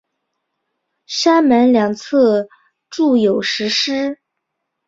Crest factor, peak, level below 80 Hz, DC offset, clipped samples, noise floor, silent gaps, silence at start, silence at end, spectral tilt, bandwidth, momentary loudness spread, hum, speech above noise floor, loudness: 16 dB; -2 dBFS; -62 dBFS; under 0.1%; under 0.1%; -76 dBFS; none; 1.1 s; 0.75 s; -4 dB/octave; 7.8 kHz; 13 LU; none; 61 dB; -15 LUFS